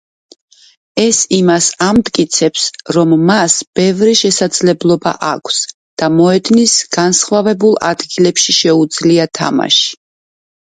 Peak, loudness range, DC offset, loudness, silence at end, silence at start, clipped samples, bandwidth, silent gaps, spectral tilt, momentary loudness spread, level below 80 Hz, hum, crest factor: 0 dBFS; 1 LU; under 0.1%; -11 LUFS; 0.85 s; 0.95 s; under 0.1%; 9.6 kHz; 3.67-3.73 s, 5.74-5.97 s; -3.5 dB/octave; 7 LU; -50 dBFS; none; 12 dB